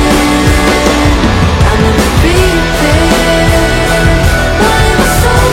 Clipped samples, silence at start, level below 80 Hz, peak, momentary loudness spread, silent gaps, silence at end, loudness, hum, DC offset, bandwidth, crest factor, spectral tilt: 0.7%; 0 s; -14 dBFS; 0 dBFS; 1 LU; none; 0 s; -8 LUFS; none; under 0.1%; 17 kHz; 8 dB; -5 dB/octave